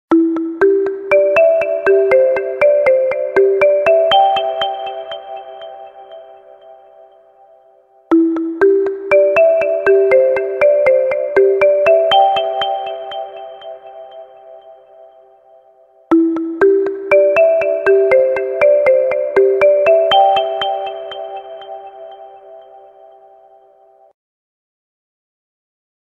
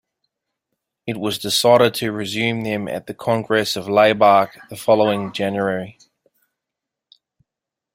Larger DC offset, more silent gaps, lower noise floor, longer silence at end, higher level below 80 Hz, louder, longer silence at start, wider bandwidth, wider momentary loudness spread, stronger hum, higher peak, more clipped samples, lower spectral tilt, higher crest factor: neither; neither; second, -49 dBFS vs -85 dBFS; first, 3.45 s vs 2.05 s; about the same, -56 dBFS vs -60 dBFS; first, -13 LUFS vs -18 LUFS; second, 0.1 s vs 1.05 s; second, 6.8 kHz vs 16 kHz; first, 19 LU vs 13 LU; neither; about the same, 0 dBFS vs -2 dBFS; neither; about the same, -5.5 dB/octave vs -4.5 dB/octave; about the same, 14 dB vs 18 dB